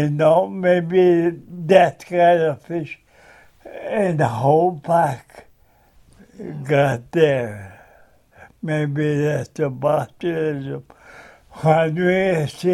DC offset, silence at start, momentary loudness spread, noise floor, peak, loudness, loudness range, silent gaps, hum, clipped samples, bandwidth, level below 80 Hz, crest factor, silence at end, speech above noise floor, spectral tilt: under 0.1%; 0 s; 17 LU; -54 dBFS; 0 dBFS; -19 LUFS; 5 LU; none; none; under 0.1%; 13 kHz; -56 dBFS; 20 dB; 0 s; 36 dB; -7.5 dB/octave